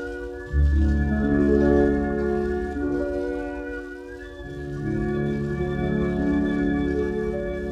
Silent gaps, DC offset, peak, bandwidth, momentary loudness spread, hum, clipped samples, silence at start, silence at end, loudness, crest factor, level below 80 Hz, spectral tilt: none; under 0.1%; -8 dBFS; 7.8 kHz; 14 LU; none; under 0.1%; 0 s; 0 s; -24 LUFS; 16 dB; -30 dBFS; -9 dB/octave